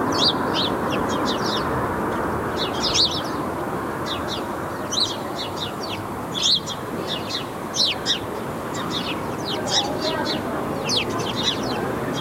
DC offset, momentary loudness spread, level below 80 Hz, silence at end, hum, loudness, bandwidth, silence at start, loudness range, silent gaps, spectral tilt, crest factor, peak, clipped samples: under 0.1%; 9 LU; -46 dBFS; 0 s; none; -23 LUFS; 16 kHz; 0 s; 2 LU; none; -3.5 dB/octave; 18 dB; -6 dBFS; under 0.1%